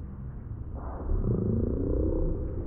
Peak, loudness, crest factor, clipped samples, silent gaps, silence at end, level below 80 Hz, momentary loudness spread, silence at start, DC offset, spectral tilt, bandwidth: -16 dBFS; -32 LUFS; 14 dB; under 0.1%; none; 0 s; -32 dBFS; 12 LU; 0 s; under 0.1%; -15 dB/octave; 2 kHz